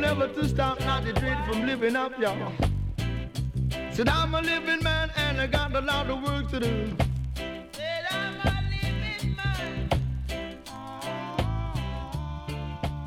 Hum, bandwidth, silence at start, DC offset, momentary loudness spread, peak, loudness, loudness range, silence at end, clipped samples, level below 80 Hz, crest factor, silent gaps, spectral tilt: none; 16 kHz; 0 s; under 0.1%; 10 LU; -10 dBFS; -28 LUFS; 5 LU; 0 s; under 0.1%; -36 dBFS; 18 dB; none; -5.5 dB/octave